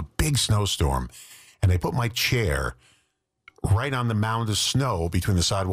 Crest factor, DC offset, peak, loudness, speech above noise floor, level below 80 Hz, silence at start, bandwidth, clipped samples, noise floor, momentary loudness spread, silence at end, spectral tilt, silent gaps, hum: 14 dB; under 0.1%; -12 dBFS; -24 LUFS; 48 dB; -36 dBFS; 0 s; 15.5 kHz; under 0.1%; -72 dBFS; 7 LU; 0 s; -4.5 dB/octave; none; none